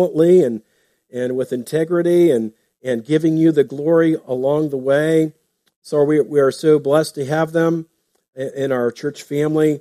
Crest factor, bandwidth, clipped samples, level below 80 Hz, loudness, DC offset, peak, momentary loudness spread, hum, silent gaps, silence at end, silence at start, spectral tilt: 14 dB; 14.5 kHz; under 0.1%; -64 dBFS; -17 LUFS; under 0.1%; -2 dBFS; 11 LU; none; 5.76-5.82 s; 0 s; 0 s; -7 dB/octave